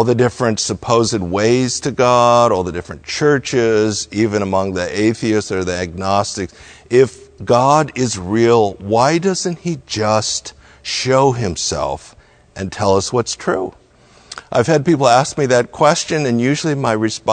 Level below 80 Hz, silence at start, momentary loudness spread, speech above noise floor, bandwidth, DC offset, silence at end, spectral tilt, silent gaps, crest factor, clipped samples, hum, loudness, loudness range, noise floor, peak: -46 dBFS; 0 s; 10 LU; 32 dB; 9.4 kHz; under 0.1%; 0 s; -4.5 dB/octave; none; 16 dB; under 0.1%; none; -16 LUFS; 4 LU; -48 dBFS; 0 dBFS